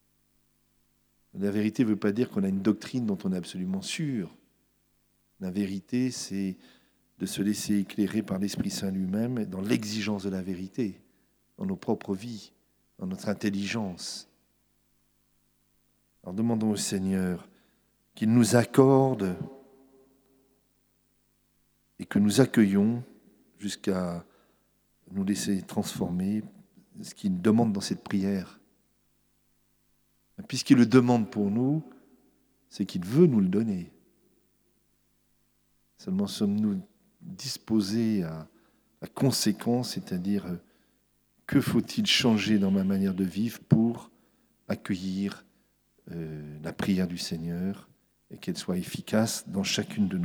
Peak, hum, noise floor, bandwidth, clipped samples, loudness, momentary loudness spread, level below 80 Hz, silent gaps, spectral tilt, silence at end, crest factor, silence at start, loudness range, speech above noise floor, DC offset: -6 dBFS; 50 Hz at -55 dBFS; -70 dBFS; 20 kHz; under 0.1%; -28 LUFS; 17 LU; -66 dBFS; none; -5.5 dB/octave; 0 s; 22 dB; 1.35 s; 8 LU; 43 dB; under 0.1%